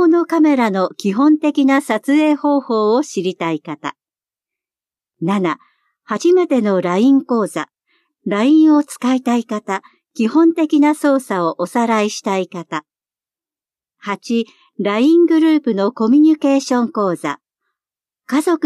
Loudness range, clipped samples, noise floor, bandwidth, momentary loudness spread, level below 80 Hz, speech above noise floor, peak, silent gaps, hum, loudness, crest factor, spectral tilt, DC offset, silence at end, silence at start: 6 LU; under 0.1%; under -90 dBFS; 12.5 kHz; 13 LU; -74 dBFS; over 75 dB; -4 dBFS; none; none; -16 LUFS; 12 dB; -5.5 dB/octave; under 0.1%; 0 s; 0 s